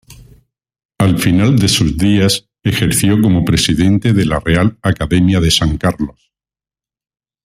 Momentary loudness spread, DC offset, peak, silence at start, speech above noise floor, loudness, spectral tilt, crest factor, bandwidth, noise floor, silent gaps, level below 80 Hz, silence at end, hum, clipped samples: 6 LU; under 0.1%; 0 dBFS; 0.1 s; over 78 dB; -13 LUFS; -5 dB/octave; 14 dB; 16 kHz; under -90 dBFS; 0.85-0.89 s; -32 dBFS; 1.35 s; none; under 0.1%